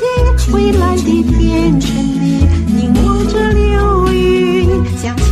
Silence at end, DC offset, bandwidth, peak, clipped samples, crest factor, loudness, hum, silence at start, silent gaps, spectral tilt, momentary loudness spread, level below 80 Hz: 0 s; under 0.1%; 14 kHz; 0 dBFS; under 0.1%; 10 dB; -12 LUFS; none; 0 s; none; -7 dB/octave; 3 LU; -16 dBFS